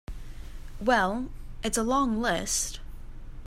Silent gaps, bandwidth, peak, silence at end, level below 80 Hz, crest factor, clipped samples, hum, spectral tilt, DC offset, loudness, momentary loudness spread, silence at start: none; 16 kHz; -10 dBFS; 0 s; -40 dBFS; 20 dB; under 0.1%; none; -3 dB/octave; under 0.1%; -27 LUFS; 22 LU; 0.1 s